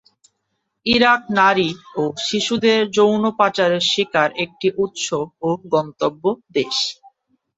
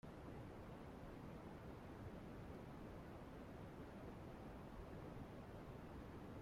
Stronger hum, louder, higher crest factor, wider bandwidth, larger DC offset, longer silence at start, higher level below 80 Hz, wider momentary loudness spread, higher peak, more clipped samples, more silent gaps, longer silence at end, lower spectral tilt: neither; first, -18 LUFS vs -56 LUFS; first, 18 dB vs 12 dB; second, 8.2 kHz vs 16 kHz; neither; first, 0.85 s vs 0.05 s; first, -56 dBFS vs -64 dBFS; first, 9 LU vs 1 LU; first, 0 dBFS vs -42 dBFS; neither; neither; first, 0.65 s vs 0 s; second, -3.5 dB/octave vs -7.5 dB/octave